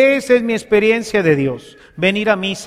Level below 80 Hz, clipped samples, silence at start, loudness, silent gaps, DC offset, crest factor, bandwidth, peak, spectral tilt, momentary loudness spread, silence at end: -50 dBFS; under 0.1%; 0 s; -15 LUFS; none; under 0.1%; 14 dB; 14.5 kHz; -2 dBFS; -5.5 dB/octave; 5 LU; 0 s